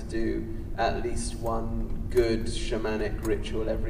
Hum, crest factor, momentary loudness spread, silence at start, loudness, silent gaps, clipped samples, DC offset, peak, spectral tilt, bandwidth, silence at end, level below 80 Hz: none; 16 dB; 7 LU; 0 s; -30 LUFS; none; under 0.1%; under 0.1%; -12 dBFS; -5.5 dB/octave; 15.5 kHz; 0 s; -34 dBFS